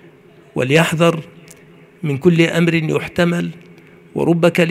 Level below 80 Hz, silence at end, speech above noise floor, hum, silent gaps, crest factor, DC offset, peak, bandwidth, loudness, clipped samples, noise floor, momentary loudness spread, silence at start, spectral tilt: -54 dBFS; 0 s; 30 dB; none; none; 18 dB; under 0.1%; 0 dBFS; 15 kHz; -16 LUFS; under 0.1%; -45 dBFS; 14 LU; 0.55 s; -6 dB/octave